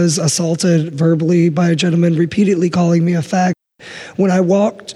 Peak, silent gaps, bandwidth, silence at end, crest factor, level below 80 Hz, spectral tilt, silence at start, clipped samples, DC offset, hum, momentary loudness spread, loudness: -4 dBFS; none; 12.5 kHz; 0 s; 10 dB; -56 dBFS; -6 dB/octave; 0 s; under 0.1%; under 0.1%; none; 5 LU; -14 LUFS